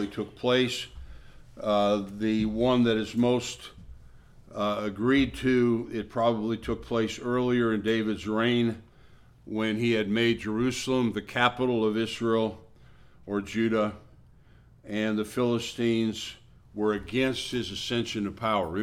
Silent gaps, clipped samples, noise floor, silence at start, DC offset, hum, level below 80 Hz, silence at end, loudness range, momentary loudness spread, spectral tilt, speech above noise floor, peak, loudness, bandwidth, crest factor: none; under 0.1%; -55 dBFS; 0 s; under 0.1%; none; -52 dBFS; 0 s; 4 LU; 9 LU; -5.5 dB/octave; 28 dB; -6 dBFS; -27 LUFS; 14 kHz; 22 dB